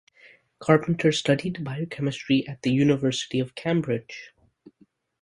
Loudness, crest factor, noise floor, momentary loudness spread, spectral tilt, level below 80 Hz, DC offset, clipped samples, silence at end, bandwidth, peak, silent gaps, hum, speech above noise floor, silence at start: -25 LUFS; 24 dB; -62 dBFS; 10 LU; -6 dB/octave; -62 dBFS; under 0.1%; under 0.1%; 0.95 s; 11.5 kHz; -2 dBFS; none; none; 38 dB; 0.6 s